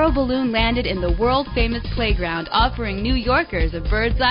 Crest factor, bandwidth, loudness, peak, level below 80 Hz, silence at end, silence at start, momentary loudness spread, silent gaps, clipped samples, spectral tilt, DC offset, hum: 14 dB; 5.4 kHz; -20 LUFS; -6 dBFS; -26 dBFS; 0 s; 0 s; 4 LU; none; under 0.1%; -3.5 dB/octave; under 0.1%; none